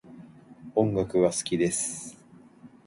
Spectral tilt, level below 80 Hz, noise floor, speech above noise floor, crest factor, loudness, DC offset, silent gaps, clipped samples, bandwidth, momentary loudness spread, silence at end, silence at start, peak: -5 dB/octave; -58 dBFS; -53 dBFS; 27 dB; 20 dB; -26 LUFS; under 0.1%; none; under 0.1%; 11.5 kHz; 16 LU; 0.2 s; 0.05 s; -8 dBFS